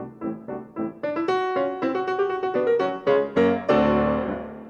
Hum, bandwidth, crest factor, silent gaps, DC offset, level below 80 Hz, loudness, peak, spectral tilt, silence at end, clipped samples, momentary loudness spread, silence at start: none; 7.6 kHz; 16 dB; none; under 0.1%; -50 dBFS; -23 LUFS; -8 dBFS; -7.5 dB/octave; 0 s; under 0.1%; 12 LU; 0 s